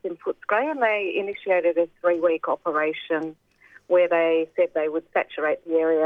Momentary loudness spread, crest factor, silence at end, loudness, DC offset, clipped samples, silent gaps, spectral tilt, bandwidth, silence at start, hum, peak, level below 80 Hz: 7 LU; 16 dB; 0 s; -23 LUFS; under 0.1%; under 0.1%; none; -6.5 dB/octave; 3.9 kHz; 0.05 s; none; -8 dBFS; -72 dBFS